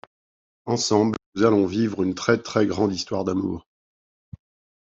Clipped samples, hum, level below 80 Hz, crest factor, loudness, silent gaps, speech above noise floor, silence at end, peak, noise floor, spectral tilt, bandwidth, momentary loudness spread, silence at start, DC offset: under 0.1%; none; -58 dBFS; 20 dB; -23 LUFS; 1.26-1.32 s; over 68 dB; 1.2 s; -4 dBFS; under -90 dBFS; -5 dB/octave; 8 kHz; 8 LU; 0.65 s; under 0.1%